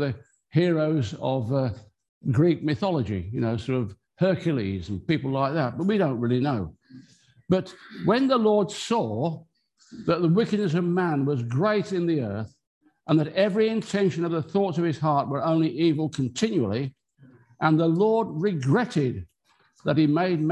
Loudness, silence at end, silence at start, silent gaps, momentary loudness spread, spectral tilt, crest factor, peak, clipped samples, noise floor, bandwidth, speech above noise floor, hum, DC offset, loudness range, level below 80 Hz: -25 LUFS; 0 s; 0 s; 2.09-2.21 s, 12.67-12.81 s; 9 LU; -7.5 dB/octave; 18 dB; -6 dBFS; under 0.1%; -64 dBFS; 11 kHz; 41 dB; none; under 0.1%; 2 LU; -54 dBFS